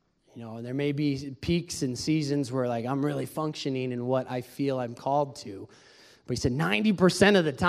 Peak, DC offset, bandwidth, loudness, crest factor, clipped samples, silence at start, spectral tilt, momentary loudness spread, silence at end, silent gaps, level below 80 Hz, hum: -6 dBFS; under 0.1%; 15 kHz; -28 LUFS; 22 dB; under 0.1%; 0.35 s; -5.5 dB/octave; 14 LU; 0 s; none; -54 dBFS; none